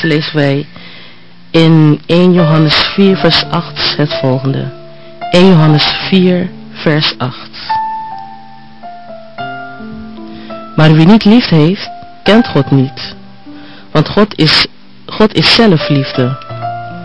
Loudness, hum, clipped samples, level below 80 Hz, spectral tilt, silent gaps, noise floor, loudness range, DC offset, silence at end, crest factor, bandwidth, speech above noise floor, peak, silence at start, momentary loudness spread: -10 LUFS; none; 0.1%; -40 dBFS; -7 dB/octave; none; -38 dBFS; 8 LU; 2%; 0 s; 10 dB; 10 kHz; 29 dB; 0 dBFS; 0 s; 20 LU